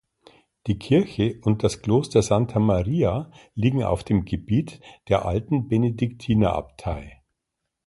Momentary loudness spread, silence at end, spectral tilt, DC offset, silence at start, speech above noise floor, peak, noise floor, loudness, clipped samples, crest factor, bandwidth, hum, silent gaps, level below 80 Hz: 11 LU; 0.8 s; -7.5 dB/octave; under 0.1%; 0.65 s; 59 dB; -4 dBFS; -81 dBFS; -23 LUFS; under 0.1%; 18 dB; 11.5 kHz; none; none; -42 dBFS